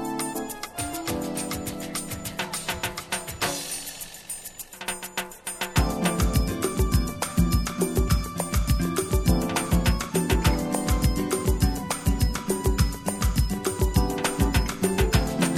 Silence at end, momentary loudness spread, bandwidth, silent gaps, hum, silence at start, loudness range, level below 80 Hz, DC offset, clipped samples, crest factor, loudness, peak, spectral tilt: 0 s; 9 LU; 17 kHz; none; none; 0 s; 6 LU; -30 dBFS; under 0.1%; under 0.1%; 18 dB; -26 LUFS; -8 dBFS; -4.5 dB/octave